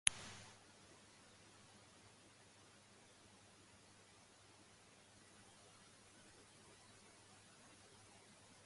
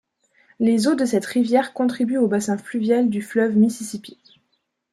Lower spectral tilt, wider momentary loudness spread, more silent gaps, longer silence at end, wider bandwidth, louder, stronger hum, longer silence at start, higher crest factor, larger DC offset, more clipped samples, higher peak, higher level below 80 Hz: second, 0 dB/octave vs -5.5 dB/octave; second, 3 LU vs 6 LU; neither; second, 0 s vs 0.8 s; second, 11.5 kHz vs 13 kHz; second, -57 LUFS vs -20 LUFS; neither; second, 0.05 s vs 0.6 s; first, 46 dB vs 16 dB; neither; neither; second, -8 dBFS vs -4 dBFS; second, -80 dBFS vs -68 dBFS